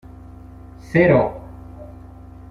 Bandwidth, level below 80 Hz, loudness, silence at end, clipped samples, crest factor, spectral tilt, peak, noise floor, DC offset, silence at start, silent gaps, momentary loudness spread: 10.5 kHz; -42 dBFS; -17 LUFS; 0.6 s; under 0.1%; 20 dB; -9 dB/octave; -2 dBFS; -40 dBFS; under 0.1%; 0.9 s; none; 27 LU